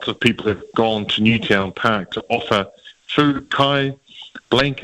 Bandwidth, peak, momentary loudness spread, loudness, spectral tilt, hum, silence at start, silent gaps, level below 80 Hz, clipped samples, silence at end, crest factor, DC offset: 13 kHz; -4 dBFS; 8 LU; -19 LUFS; -5.5 dB/octave; none; 0 s; none; -48 dBFS; under 0.1%; 0 s; 16 dB; under 0.1%